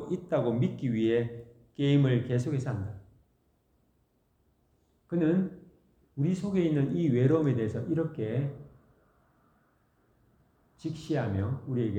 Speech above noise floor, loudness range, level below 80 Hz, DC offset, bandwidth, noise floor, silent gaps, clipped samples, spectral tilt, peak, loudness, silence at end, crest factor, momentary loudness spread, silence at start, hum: 43 dB; 9 LU; -64 dBFS; under 0.1%; 9 kHz; -71 dBFS; none; under 0.1%; -8.5 dB/octave; -14 dBFS; -29 LUFS; 0 s; 18 dB; 14 LU; 0 s; none